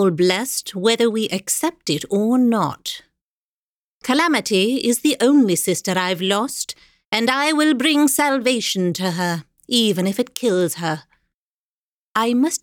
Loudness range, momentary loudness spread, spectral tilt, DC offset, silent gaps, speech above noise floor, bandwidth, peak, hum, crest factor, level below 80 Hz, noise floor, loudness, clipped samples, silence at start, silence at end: 3 LU; 9 LU; -3.5 dB/octave; under 0.1%; 3.22-4.01 s, 7.05-7.12 s, 11.34-12.15 s; over 71 dB; 19.5 kHz; 0 dBFS; none; 20 dB; -66 dBFS; under -90 dBFS; -19 LUFS; under 0.1%; 0 s; 0.05 s